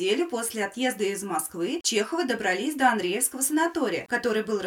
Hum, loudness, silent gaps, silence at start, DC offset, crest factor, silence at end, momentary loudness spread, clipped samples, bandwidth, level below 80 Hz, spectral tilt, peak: none; -26 LUFS; none; 0 s; under 0.1%; 20 dB; 0 s; 6 LU; under 0.1%; 19 kHz; -68 dBFS; -2.5 dB/octave; -6 dBFS